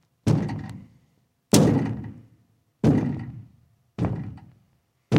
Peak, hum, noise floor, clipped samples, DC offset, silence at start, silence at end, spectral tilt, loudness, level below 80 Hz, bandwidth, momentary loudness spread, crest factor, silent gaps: -2 dBFS; none; -66 dBFS; under 0.1%; under 0.1%; 0.25 s; 0 s; -6 dB/octave; -24 LUFS; -48 dBFS; 16 kHz; 22 LU; 24 dB; none